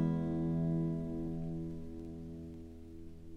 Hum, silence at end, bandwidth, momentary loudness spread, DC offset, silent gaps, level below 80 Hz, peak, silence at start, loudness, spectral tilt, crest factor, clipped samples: none; 0 s; 4.2 kHz; 17 LU; under 0.1%; none; -52 dBFS; -22 dBFS; 0 s; -38 LUFS; -10.5 dB/octave; 16 dB; under 0.1%